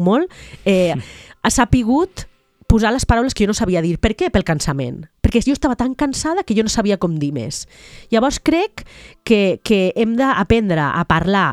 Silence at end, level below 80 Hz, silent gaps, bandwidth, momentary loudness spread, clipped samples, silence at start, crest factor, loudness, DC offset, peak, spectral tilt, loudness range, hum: 0 s; -30 dBFS; none; 14 kHz; 10 LU; under 0.1%; 0 s; 16 dB; -17 LUFS; under 0.1%; 0 dBFS; -5.5 dB/octave; 2 LU; none